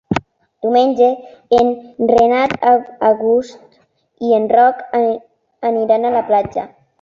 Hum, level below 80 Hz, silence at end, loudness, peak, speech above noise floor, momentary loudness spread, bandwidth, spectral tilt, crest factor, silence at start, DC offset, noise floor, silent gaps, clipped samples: none; -50 dBFS; 0.35 s; -15 LUFS; -2 dBFS; 43 dB; 12 LU; 7.4 kHz; -6.5 dB/octave; 14 dB; 0.1 s; under 0.1%; -57 dBFS; none; under 0.1%